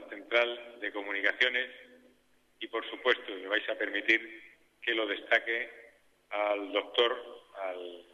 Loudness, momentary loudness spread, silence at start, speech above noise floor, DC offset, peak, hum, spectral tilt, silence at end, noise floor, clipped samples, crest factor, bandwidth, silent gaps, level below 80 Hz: -31 LUFS; 13 LU; 0 s; 35 dB; under 0.1%; -12 dBFS; none; -2 dB/octave; 0.1 s; -67 dBFS; under 0.1%; 22 dB; 10.5 kHz; none; -80 dBFS